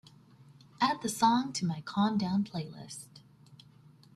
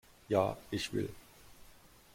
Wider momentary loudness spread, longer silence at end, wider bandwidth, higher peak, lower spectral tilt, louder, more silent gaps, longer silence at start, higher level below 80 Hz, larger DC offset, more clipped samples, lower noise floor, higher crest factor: first, 18 LU vs 11 LU; first, 0.6 s vs 0.45 s; second, 14.5 kHz vs 16.5 kHz; about the same, -14 dBFS vs -14 dBFS; about the same, -4.5 dB/octave vs -5.5 dB/octave; first, -31 LUFS vs -36 LUFS; neither; first, 0.8 s vs 0.3 s; second, -70 dBFS vs -62 dBFS; neither; neither; about the same, -58 dBFS vs -59 dBFS; about the same, 20 dB vs 24 dB